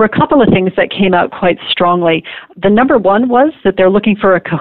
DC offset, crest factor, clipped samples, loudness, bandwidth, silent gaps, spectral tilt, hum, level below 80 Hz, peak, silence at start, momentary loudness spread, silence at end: 0.9%; 10 dB; under 0.1%; -11 LUFS; 4.5 kHz; none; -10.5 dB/octave; none; -40 dBFS; 0 dBFS; 0 s; 5 LU; 0 s